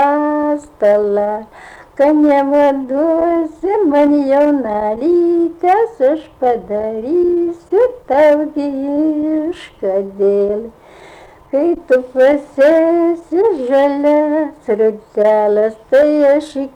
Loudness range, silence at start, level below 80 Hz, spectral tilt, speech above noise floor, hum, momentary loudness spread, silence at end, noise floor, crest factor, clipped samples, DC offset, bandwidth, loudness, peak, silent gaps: 3 LU; 0 s; -50 dBFS; -7 dB/octave; 26 dB; none; 7 LU; 0.05 s; -39 dBFS; 10 dB; under 0.1%; under 0.1%; 10 kHz; -14 LUFS; -4 dBFS; none